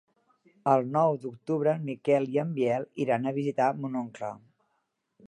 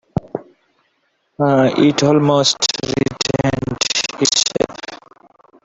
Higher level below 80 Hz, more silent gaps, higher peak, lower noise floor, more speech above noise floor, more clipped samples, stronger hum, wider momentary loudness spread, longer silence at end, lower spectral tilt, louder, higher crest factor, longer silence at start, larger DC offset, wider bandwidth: second, -78 dBFS vs -46 dBFS; neither; second, -10 dBFS vs -2 dBFS; first, -78 dBFS vs -65 dBFS; about the same, 50 dB vs 52 dB; neither; neither; second, 9 LU vs 12 LU; first, 0.9 s vs 0.7 s; first, -8 dB/octave vs -4 dB/octave; second, -28 LUFS vs -16 LUFS; about the same, 20 dB vs 16 dB; first, 0.65 s vs 0.15 s; neither; first, 11 kHz vs 8.2 kHz